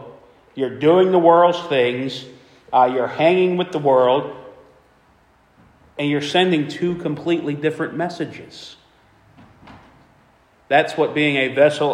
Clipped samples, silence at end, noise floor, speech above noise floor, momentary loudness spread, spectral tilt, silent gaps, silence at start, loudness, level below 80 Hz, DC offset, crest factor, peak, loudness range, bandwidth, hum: under 0.1%; 0 s; -55 dBFS; 38 dB; 18 LU; -6 dB/octave; none; 0 s; -18 LUFS; -62 dBFS; under 0.1%; 18 dB; 0 dBFS; 9 LU; 10.5 kHz; none